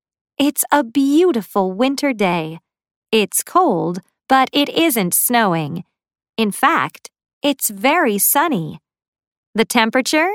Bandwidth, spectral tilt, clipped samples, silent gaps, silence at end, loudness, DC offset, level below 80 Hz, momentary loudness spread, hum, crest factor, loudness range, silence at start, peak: 19 kHz; -3.5 dB/octave; under 0.1%; 2.96-3.02 s, 7.33-7.41 s, 9.08-9.13 s, 9.27-9.53 s; 0 s; -16 LUFS; under 0.1%; -64 dBFS; 11 LU; none; 18 dB; 1 LU; 0.4 s; 0 dBFS